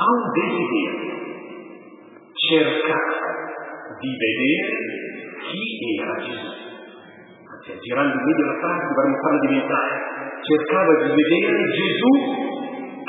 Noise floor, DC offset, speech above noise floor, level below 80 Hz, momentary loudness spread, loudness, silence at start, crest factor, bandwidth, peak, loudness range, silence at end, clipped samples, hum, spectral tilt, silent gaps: -45 dBFS; under 0.1%; 24 dB; -78 dBFS; 17 LU; -21 LUFS; 0 s; 18 dB; 4 kHz; -2 dBFS; 6 LU; 0 s; under 0.1%; none; -8.5 dB/octave; none